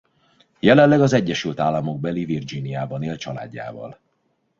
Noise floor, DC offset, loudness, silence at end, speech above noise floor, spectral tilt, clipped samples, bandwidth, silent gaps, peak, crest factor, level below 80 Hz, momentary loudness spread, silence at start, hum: -69 dBFS; under 0.1%; -20 LUFS; 0.65 s; 49 dB; -6.5 dB/octave; under 0.1%; 7.6 kHz; none; 0 dBFS; 20 dB; -56 dBFS; 19 LU; 0.65 s; none